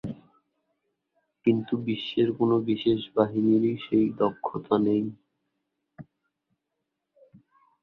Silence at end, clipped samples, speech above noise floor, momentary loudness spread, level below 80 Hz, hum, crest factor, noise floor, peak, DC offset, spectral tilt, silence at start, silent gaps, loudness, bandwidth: 1.8 s; under 0.1%; 58 dB; 6 LU; -64 dBFS; none; 20 dB; -83 dBFS; -8 dBFS; under 0.1%; -9.5 dB/octave; 0.05 s; none; -26 LUFS; 5 kHz